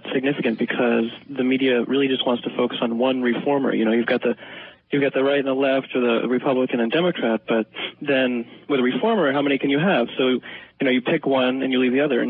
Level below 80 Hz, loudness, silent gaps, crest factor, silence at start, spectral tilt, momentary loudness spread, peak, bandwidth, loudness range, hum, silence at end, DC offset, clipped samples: -70 dBFS; -21 LUFS; none; 14 dB; 0.05 s; -10.5 dB/octave; 6 LU; -6 dBFS; 4.6 kHz; 1 LU; none; 0 s; under 0.1%; under 0.1%